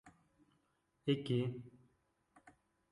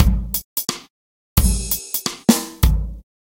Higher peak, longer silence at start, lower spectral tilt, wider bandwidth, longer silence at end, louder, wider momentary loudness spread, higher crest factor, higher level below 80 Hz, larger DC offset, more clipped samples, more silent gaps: second, -22 dBFS vs 0 dBFS; about the same, 0.05 s vs 0 s; first, -8 dB/octave vs -4.5 dB/octave; second, 11 kHz vs 17 kHz; first, 0.4 s vs 0.2 s; second, -39 LUFS vs -20 LUFS; first, 17 LU vs 8 LU; about the same, 22 dB vs 20 dB; second, -76 dBFS vs -22 dBFS; neither; neither; second, none vs 0.44-0.56 s, 0.90-1.36 s